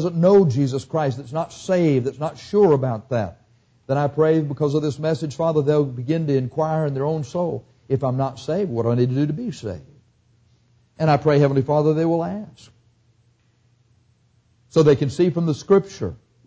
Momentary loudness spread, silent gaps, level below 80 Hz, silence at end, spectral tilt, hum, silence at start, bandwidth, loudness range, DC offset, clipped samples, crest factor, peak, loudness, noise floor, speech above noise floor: 11 LU; none; -54 dBFS; 0.3 s; -8 dB/octave; none; 0 s; 8 kHz; 3 LU; under 0.1%; under 0.1%; 16 dB; -6 dBFS; -21 LUFS; -61 dBFS; 41 dB